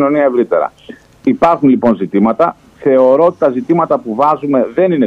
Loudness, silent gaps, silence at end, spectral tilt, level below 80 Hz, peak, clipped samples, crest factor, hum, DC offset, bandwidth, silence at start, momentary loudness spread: -12 LUFS; none; 0 s; -9 dB/octave; -50 dBFS; 0 dBFS; under 0.1%; 12 dB; none; under 0.1%; 7.2 kHz; 0 s; 6 LU